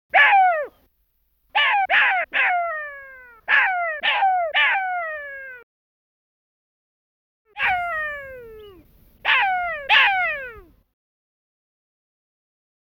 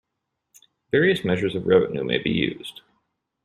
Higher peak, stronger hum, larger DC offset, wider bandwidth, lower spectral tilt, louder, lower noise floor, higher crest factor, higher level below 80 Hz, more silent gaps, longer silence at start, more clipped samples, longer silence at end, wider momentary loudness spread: about the same, -4 dBFS vs -6 dBFS; neither; neither; first, 16 kHz vs 13.5 kHz; second, -1.5 dB/octave vs -6.5 dB/octave; first, -19 LUFS vs -22 LUFS; second, -67 dBFS vs -80 dBFS; about the same, 18 dB vs 18 dB; about the same, -58 dBFS vs -58 dBFS; first, 5.63-7.45 s vs none; second, 0.15 s vs 0.95 s; neither; first, 2.25 s vs 0.75 s; first, 20 LU vs 8 LU